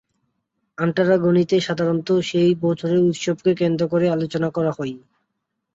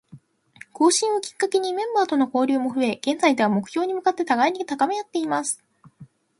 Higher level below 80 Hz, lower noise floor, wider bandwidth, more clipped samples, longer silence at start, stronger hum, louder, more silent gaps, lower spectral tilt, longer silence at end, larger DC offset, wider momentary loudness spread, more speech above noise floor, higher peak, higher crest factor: first, -62 dBFS vs -72 dBFS; first, -77 dBFS vs -50 dBFS; second, 8 kHz vs 11.5 kHz; neither; first, 0.8 s vs 0.15 s; neither; about the same, -20 LUFS vs -22 LUFS; neither; first, -7 dB/octave vs -3.5 dB/octave; first, 0.75 s vs 0.35 s; neither; about the same, 6 LU vs 6 LU; first, 58 dB vs 28 dB; about the same, -4 dBFS vs -4 dBFS; about the same, 16 dB vs 18 dB